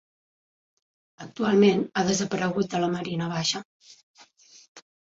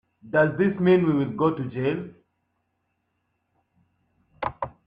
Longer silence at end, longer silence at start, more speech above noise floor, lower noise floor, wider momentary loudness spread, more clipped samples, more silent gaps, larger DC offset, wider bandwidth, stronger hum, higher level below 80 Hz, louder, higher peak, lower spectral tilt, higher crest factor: about the same, 0.25 s vs 0.15 s; first, 1.2 s vs 0.25 s; second, 29 dB vs 53 dB; second, -54 dBFS vs -75 dBFS; second, 11 LU vs 14 LU; neither; first, 3.65-3.80 s, 4.03-4.14 s, 4.68-4.75 s vs none; neither; first, 7.8 kHz vs 5 kHz; neither; about the same, -64 dBFS vs -60 dBFS; about the same, -25 LUFS vs -24 LUFS; about the same, -8 dBFS vs -8 dBFS; second, -5 dB/octave vs -10 dB/octave; about the same, 20 dB vs 18 dB